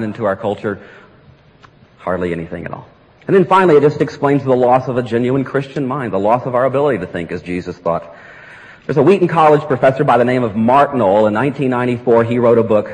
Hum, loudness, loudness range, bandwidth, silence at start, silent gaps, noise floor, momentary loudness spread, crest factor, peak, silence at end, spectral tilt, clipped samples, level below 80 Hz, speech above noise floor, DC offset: none; -14 LUFS; 6 LU; 10 kHz; 0 s; none; -46 dBFS; 13 LU; 12 dB; -2 dBFS; 0 s; -8 dB/octave; under 0.1%; -52 dBFS; 32 dB; under 0.1%